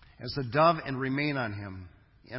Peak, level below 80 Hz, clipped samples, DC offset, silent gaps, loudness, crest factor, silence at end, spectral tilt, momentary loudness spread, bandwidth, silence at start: -10 dBFS; -56 dBFS; under 0.1%; under 0.1%; none; -29 LUFS; 20 dB; 0 s; -10 dB/octave; 17 LU; 5.8 kHz; 0.2 s